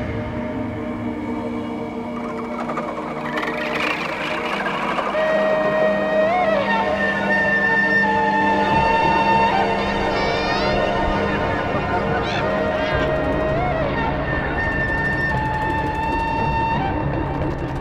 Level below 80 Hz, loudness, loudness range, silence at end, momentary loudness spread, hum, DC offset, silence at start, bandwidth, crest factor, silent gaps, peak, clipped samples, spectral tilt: -34 dBFS; -20 LUFS; 7 LU; 0 s; 10 LU; none; under 0.1%; 0 s; 14 kHz; 14 dB; none; -6 dBFS; under 0.1%; -6.5 dB/octave